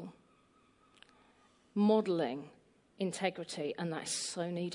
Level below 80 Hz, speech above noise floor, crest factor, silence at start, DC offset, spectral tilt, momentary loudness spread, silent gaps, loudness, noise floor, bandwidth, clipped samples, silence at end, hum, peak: -82 dBFS; 34 dB; 20 dB; 0 s; under 0.1%; -4.5 dB/octave; 13 LU; none; -35 LUFS; -68 dBFS; 11 kHz; under 0.1%; 0 s; none; -18 dBFS